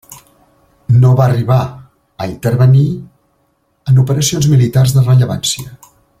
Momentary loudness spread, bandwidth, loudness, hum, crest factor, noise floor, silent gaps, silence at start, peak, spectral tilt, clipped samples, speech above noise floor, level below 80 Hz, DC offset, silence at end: 15 LU; 15.5 kHz; -12 LUFS; none; 12 dB; -60 dBFS; none; 0.1 s; -2 dBFS; -6 dB/octave; under 0.1%; 49 dB; -44 dBFS; under 0.1%; 0.45 s